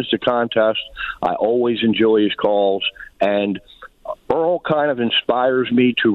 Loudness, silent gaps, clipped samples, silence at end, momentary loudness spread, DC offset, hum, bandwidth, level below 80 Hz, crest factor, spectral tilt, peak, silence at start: -18 LUFS; none; under 0.1%; 0 s; 9 LU; under 0.1%; none; 5 kHz; -52 dBFS; 14 dB; -7.5 dB/octave; -4 dBFS; 0 s